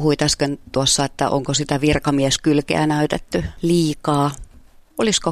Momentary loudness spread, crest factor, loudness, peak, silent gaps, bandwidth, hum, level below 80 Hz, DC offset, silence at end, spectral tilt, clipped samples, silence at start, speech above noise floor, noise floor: 6 LU; 16 dB; -19 LUFS; -2 dBFS; none; 14.5 kHz; none; -40 dBFS; under 0.1%; 0 s; -4.5 dB/octave; under 0.1%; 0 s; 28 dB; -46 dBFS